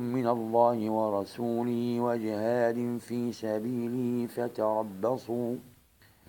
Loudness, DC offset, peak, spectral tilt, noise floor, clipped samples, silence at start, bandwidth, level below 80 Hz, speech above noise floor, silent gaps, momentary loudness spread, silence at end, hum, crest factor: -30 LUFS; under 0.1%; -12 dBFS; -7.5 dB/octave; -61 dBFS; under 0.1%; 0 s; 17 kHz; -74 dBFS; 32 dB; none; 7 LU; 0.6 s; none; 18 dB